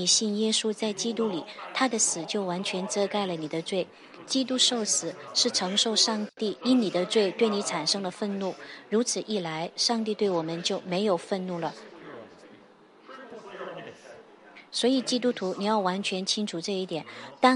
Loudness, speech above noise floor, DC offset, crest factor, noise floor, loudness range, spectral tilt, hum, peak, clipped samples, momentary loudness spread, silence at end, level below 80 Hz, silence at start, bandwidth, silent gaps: -27 LUFS; 27 dB; under 0.1%; 22 dB; -55 dBFS; 8 LU; -3 dB/octave; none; -6 dBFS; under 0.1%; 16 LU; 0 s; -80 dBFS; 0 s; 11.5 kHz; none